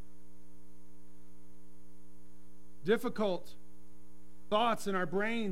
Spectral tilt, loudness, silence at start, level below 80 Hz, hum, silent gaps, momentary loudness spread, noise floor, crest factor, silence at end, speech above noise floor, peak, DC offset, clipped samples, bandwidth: -5 dB/octave; -34 LUFS; 2.8 s; -68 dBFS; none; none; 11 LU; -61 dBFS; 22 dB; 0 s; 28 dB; -16 dBFS; 1%; under 0.1%; 16 kHz